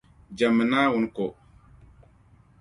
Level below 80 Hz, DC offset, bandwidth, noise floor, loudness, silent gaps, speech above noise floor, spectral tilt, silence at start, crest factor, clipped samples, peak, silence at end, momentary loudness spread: -58 dBFS; under 0.1%; 11 kHz; -57 dBFS; -24 LUFS; none; 34 dB; -6 dB/octave; 0.3 s; 18 dB; under 0.1%; -8 dBFS; 1.3 s; 12 LU